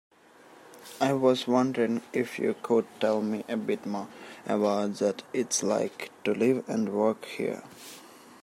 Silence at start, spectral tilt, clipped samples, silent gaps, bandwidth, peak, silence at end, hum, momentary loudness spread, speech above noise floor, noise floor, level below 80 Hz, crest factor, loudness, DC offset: 0.65 s; -4.5 dB/octave; under 0.1%; none; 16 kHz; -10 dBFS; 0.1 s; none; 16 LU; 27 dB; -55 dBFS; -80 dBFS; 18 dB; -28 LUFS; under 0.1%